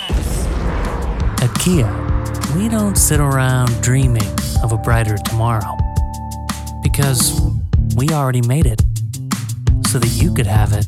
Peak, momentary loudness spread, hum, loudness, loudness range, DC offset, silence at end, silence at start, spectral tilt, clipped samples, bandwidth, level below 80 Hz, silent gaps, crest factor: -2 dBFS; 8 LU; none; -17 LUFS; 2 LU; under 0.1%; 0 s; 0 s; -5 dB/octave; under 0.1%; 16.5 kHz; -22 dBFS; none; 12 dB